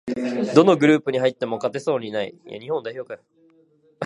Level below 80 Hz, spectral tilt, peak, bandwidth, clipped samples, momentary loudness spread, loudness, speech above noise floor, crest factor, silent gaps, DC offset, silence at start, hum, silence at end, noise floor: -68 dBFS; -6.5 dB/octave; 0 dBFS; 11 kHz; under 0.1%; 19 LU; -21 LUFS; 37 dB; 22 dB; none; under 0.1%; 0.05 s; none; 0 s; -58 dBFS